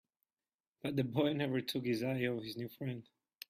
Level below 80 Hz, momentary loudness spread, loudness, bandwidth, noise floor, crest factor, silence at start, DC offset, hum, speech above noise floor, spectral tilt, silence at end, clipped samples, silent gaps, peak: -76 dBFS; 10 LU; -37 LUFS; 15.5 kHz; under -90 dBFS; 18 dB; 0.85 s; under 0.1%; none; over 53 dB; -6.5 dB/octave; 0.45 s; under 0.1%; none; -20 dBFS